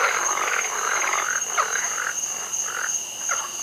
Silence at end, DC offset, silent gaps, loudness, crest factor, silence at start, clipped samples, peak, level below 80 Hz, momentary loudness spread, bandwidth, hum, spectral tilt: 0 s; under 0.1%; none; -23 LUFS; 18 dB; 0 s; under 0.1%; -6 dBFS; -68 dBFS; 4 LU; 16 kHz; none; 2 dB/octave